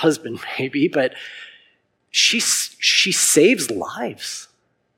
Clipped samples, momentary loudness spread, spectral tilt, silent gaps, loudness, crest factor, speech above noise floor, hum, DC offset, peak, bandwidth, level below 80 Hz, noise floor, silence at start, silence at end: under 0.1%; 16 LU; -2 dB/octave; none; -18 LUFS; 18 dB; 42 dB; none; under 0.1%; -2 dBFS; 16.5 kHz; -72 dBFS; -61 dBFS; 0 s; 0.5 s